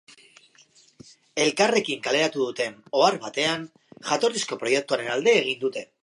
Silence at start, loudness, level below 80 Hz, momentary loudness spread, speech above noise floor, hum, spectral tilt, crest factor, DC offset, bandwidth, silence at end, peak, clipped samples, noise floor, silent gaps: 1.35 s; -24 LUFS; -76 dBFS; 10 LU; 33 dB; none; -2.5 dB/octave; 20 dB; under 0.1%; 11.5 kHz; 0.2 s; -4 dBFS; under 0.1%; -57 dBFS; none